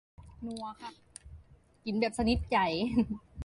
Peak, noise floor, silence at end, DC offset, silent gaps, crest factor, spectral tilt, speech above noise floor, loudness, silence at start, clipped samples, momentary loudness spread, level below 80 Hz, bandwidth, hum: -14 dBFS; -57 dBFS; 0 s; under 0.1%; none; 20 dB; -5.5 dB/octave; 26 dB; -32 LUFS; 0.2 s; under 0.1%; 20 LU; -48 dBFS; 11.5 kHz; none